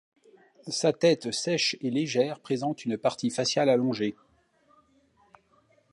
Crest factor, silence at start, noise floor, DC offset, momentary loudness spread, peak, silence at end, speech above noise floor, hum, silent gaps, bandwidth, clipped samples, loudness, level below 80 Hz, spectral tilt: 18 dB; 0.65 s; -65 dBFS; under 0.1%; 7 LU; -10 dBFS; 1.8 s; 38 dB; none; none; 11.5 kHz; under 0.1%; -27 LUFS; -74 dBFS; -4 dB/octave